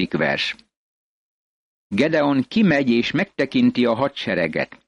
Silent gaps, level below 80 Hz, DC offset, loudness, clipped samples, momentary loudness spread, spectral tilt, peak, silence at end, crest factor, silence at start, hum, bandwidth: 0.77-1.90 s; -56 dBFS; under 0.1%; -20 LUFS; under 0.1%; 6 LU; -6.5 dB/octave; -6 dBFS; 0.15 s; 14 dB; 0 s; none; 9.4 kHz